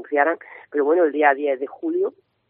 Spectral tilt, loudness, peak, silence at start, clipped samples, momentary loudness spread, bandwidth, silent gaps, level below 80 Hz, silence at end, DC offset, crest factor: -1.5 dB/octave; -21 LUFS; -2 dBFS; 0 s; under 0.1%; 10 LU; 3.7 kHz; none; -82 dBFS; 0.4 s; under 0.1%; 18 dB